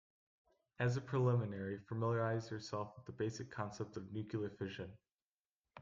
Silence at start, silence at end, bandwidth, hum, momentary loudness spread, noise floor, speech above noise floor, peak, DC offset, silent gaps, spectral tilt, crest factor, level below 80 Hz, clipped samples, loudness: 0.8 s; 0 s; 7.6 kHz; none; 10 LU; under -90 dBFS; over 50 dB; -24 dBFS; under 0.1%; 5.22-5.60 s; -7 dB/octave; 16 dB; -74 dBFS; under 0.1%; -41 LUFS